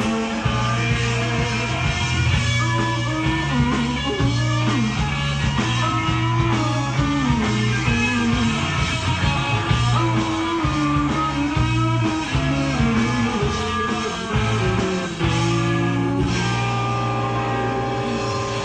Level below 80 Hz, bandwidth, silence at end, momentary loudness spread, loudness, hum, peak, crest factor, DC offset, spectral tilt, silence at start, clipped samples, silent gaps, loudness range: -32 dBFS; 9.4 kHz; 0 s; 3 LU; -21 LUFS; none; -6 dBFS; 14 dB; under 0.1%; -5.5 dB/octave; 0 s; under 0.1%; none; 1 LU